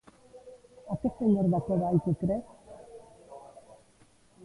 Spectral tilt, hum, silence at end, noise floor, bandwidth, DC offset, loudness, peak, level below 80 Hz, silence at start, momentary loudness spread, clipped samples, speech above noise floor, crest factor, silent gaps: -10.5 dB/octave; none; 1 s; -61 dBFS; 11.5 kHz; under 0.1%; -29 LUFS; -14 dBFS; -58 dBFS; 0.35 s; 25 LU; under 0.1%; 34 dB; 16 dB; none